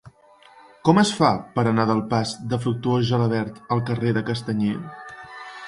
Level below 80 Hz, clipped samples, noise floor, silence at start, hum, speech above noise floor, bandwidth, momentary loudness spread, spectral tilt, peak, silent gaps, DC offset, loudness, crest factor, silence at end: -56 dBFS; under 0.1%; -52 dBFS; 0.05 s; none; 30 dB; 11.5 kHz; 15 LU; -6 dB/octave; -2 dBFS; none; under 0.1%; -22 LUFS; 20 dB; 0 s